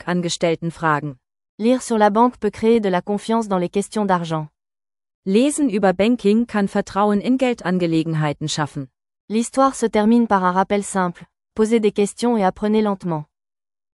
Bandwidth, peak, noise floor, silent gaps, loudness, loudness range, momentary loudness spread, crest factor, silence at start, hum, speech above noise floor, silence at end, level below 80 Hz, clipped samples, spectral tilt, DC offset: 12 kHz; -2 dBFS; under -90 dBFS; 1.49-1.58 s, 5.15-5.23 s, 9.20-9.28 s; -19 LUFS; 2 LU; 9 LU; 16 dB; 0.05 s; none; over 72 dB; 0.7 s; -54 dBFS; under 0.1%; -5.5 dB/octave; under 0.1%